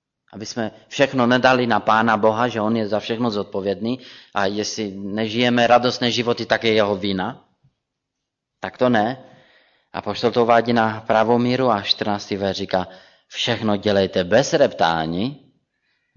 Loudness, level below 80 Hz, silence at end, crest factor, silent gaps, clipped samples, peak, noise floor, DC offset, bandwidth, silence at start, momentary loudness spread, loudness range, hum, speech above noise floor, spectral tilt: -20 LUFS; -58 dBFS; 0.8 s; 18 dB; none; under 0.1%; -2 dBFS; -80 dBFS; under 0.1%; 7.4 kHz; 0.35 s; 12 LU; 4 LU; none; 61 dB; -5 dB/octave